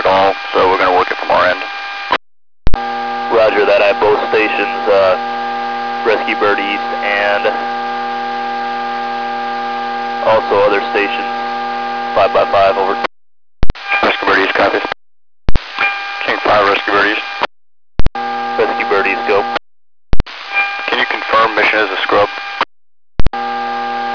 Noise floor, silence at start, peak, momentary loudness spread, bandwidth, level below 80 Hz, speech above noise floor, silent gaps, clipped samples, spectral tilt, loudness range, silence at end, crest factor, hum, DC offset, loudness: under -90 dBFS; 0 s; 0 dBFS; 10 LU; 5.4 kHz; -28 dBFS; over 77 dB; none; 2%; -5 dB/octave; 3 LU; 0 s; 14 dB; none; 0.7%; -14 LUFS